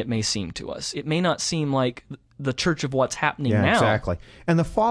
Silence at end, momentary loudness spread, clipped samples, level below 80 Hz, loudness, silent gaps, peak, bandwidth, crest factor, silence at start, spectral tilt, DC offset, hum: 0 s; 11 LU; under 0.1%; -46 dBFS; -24 LUFS; none; -6 dBFS; 11 kHz; 18 dB; 0 s; -5 dB/octave; under 0.1%; none